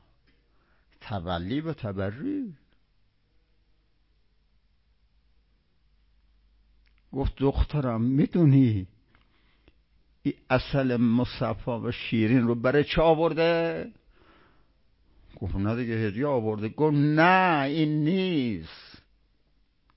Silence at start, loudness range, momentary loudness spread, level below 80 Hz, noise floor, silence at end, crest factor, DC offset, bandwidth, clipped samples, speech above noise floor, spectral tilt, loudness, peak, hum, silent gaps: 1 s; 11 LU; 14 LU; -44 dBFS; -67 dBFS; 1.15 s; 20 dB; under 0.1%; 5.8 kHz; under 0.1%; 43 dB; -11.5 dB/octave; -26 LUFS; -8 dBFS; none; none